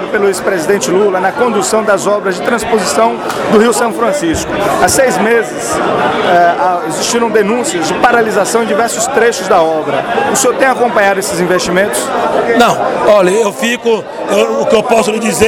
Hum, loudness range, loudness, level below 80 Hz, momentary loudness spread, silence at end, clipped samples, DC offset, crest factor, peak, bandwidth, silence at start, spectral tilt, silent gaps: none; 1 LU; -11 LUFS; -42 dBFS; 5 LU; 0 s; 0.3%; under 0.1%; 10 dB; 0 dBFS; 18 kHz; 0 s; -3.5 dB/octave; none